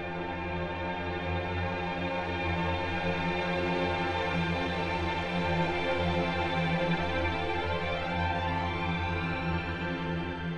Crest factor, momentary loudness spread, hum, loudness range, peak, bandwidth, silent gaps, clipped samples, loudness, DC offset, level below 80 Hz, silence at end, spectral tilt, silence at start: 14 dB; 5 LU; none; 2 LU; -18 dBFS; 9.4 kHz; none; under 0.1%; -31 LUFS; under 0.1%; -46 dBFS; 0 s; -6.5 dB/octave; 0 s